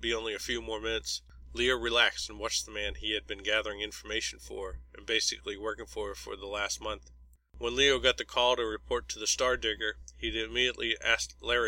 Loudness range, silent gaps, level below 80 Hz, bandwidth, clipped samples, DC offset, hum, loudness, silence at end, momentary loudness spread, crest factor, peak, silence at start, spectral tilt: 5 LU; none; -50 dBFS; 16.5 kHz; under 0.1%; under 0.1%; none; -31 LUFS; 0 s; 13 LU; 22 dB; -10 dBFS; 0 s; -1.5 dB/octave